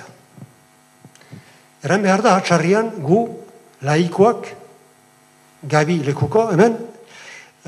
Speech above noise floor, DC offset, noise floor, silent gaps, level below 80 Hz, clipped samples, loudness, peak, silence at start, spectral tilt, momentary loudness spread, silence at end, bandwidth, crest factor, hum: 36 dB; under 0.1%; -52 dBFS; none; -68 dBFS; under 0.1%; -17 LUFS; 0 dBFS; 0 s; -6 dB/octave; 23 LU; 0.25 s; 13 kHz; 18 dB; none